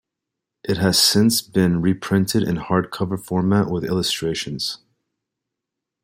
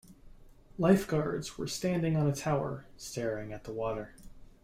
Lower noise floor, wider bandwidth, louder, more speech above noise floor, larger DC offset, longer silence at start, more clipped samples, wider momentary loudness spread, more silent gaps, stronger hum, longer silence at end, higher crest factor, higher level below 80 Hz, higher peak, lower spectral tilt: first, -83 dBFS vs -54 dBFS; about the same, 16.5 kHz vs 15.5 kHz; first, -20 LUFS vs -32 LUFS; first, 64 dB vs 23 dB; neither; first, 0.65 s vs 0.1 s; neither; second, 11 LU vs 14 LU; neither; neither; first, 1.25 s vs 0.2 s; about the same, 18 dB vs 20 dB; about the same, -52 dBFS vs -54 dBFS; first, -2 dBFS vs -12 dBFS; second, -4.5 dB/octave vs -6 dB/octave